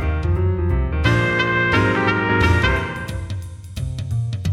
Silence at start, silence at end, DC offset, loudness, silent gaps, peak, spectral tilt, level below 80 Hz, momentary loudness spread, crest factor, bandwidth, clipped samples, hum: 0 s; 0 s; under 0.1%; -19 LUFS; none; -2 dBFS; -6.5 dB/octave; -28 dBFS; 12 LU; 16 dB; 12.5 kHz; under 0.1%; none